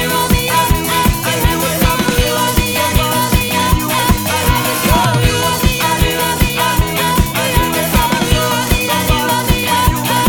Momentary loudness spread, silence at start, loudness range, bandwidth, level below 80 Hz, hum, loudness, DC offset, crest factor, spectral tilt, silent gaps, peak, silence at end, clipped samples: 1 LU; 0 s; 0 LU; over 20 kHz; -22 dBFS; none; -13 LUFS; under 0.1%; 14 dB; -4 dB/octave; none; 0 dBFS; 0 s; under 0.1%